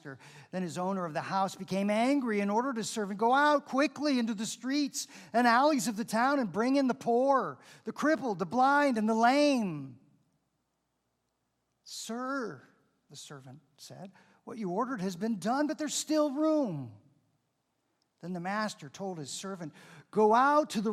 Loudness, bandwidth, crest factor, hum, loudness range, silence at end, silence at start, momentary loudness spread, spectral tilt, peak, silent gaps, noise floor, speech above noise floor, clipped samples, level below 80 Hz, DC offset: -30 LUFS; 15.5 kHz; 20 dB; none; 14 LU; 0 s; 0.05 s; 19 LU; -4.5 dB/octave; -12 dBFS; none; -80 dBFS; 50 dB; under 0.1%; -82 dBFS; under 0.1%